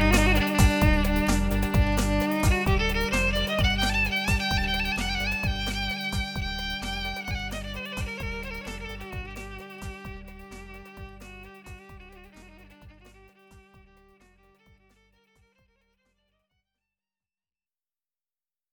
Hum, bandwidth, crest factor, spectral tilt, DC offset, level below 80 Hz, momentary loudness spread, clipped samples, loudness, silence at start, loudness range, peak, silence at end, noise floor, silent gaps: none; over 20 kHz; 20 dB; -4.5 dB/octave; under 0.1%; -32 dBFS; 22 LU; under 0.1%; -26 LUFS; 0 s; 22 LU; -8 dBFS; 5.15 s; under -90 dBFS; none